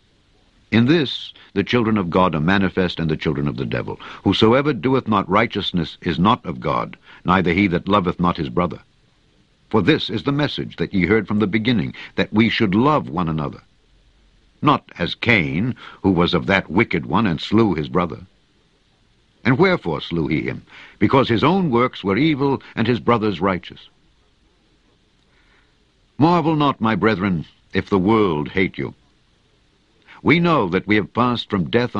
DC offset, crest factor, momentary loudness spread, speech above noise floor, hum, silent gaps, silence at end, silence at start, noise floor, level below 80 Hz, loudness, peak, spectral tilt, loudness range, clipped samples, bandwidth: under 0.1%; 20 dB; 9 LU; 41 dB; none; none; 0 s; 0.7 s; -59 dBFS; -46 dBFS; -19 LUFS; 0 dBFS; -7.5 dB/octave; 3 LU; under 0.1%; 7.6 kHz